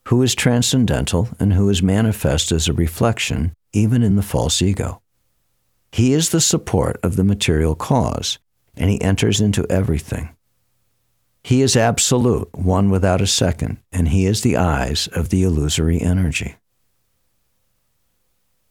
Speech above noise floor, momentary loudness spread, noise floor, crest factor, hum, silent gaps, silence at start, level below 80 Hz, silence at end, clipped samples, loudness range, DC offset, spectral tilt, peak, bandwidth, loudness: 52 dB; 8 LU; -69 dBFS; 14 dB; none; none; 0.05 s; -32 dBFS; 2.2 s; under 0.1%; 4 LU; under 0.1%; -5 dB/octave; -4 dBFS; 17 kHz; -18 LUFS